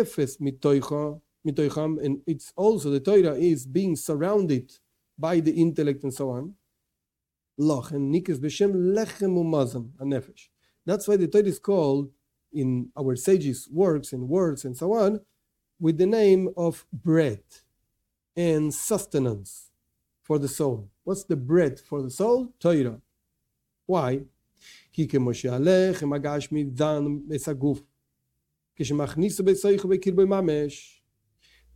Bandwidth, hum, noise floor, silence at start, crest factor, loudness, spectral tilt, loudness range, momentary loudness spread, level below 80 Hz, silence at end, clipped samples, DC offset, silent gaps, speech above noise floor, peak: 16.5 kHz; none; -87 dBFS; 0 s; 18 dB; -25 LUFS; -6.5 dB/octave; 4 LU; 11 LU; -60 dBFS; 0.9 s; under 0.1%; under 0.1%; none; 63 dB; -8 dBFS